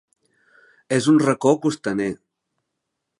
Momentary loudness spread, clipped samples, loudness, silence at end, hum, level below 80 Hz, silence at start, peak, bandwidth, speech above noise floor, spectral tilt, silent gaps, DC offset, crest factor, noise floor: 10 LU; under 0.1%; -20 LUFS; 1.05 s; none; -64 dBFS; 0.9 s; -2 dBFS; 11.5 kHz; 60 dB; -6 dB/octave; none; under 0.1%; 20 dB; -79 dBFS